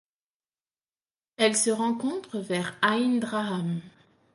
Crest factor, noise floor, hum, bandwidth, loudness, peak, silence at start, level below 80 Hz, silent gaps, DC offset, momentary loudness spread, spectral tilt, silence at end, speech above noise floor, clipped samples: 20 dB; under -90 dBFS; none; 11.5 kHz; -27 LUFS; -8 dBFS; 1.4 s; -74 dBFS; none; under 0.1%; 9 LU; -3.5 dB/octave; 0.45 s; over 63 dB; under 0.1%